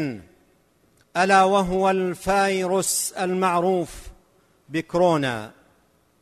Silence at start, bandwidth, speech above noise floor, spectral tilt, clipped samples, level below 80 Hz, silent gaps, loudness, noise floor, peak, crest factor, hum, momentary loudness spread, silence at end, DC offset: 0 s; 13.5 kHz; 40 dB; -4 dB/octave; under 0.1%; -50 dBFS; none; -21 LUFS; -62 dBFS; -6 dBFS; 18 dB; none; 15 LU; 0.75 s; under 0.1%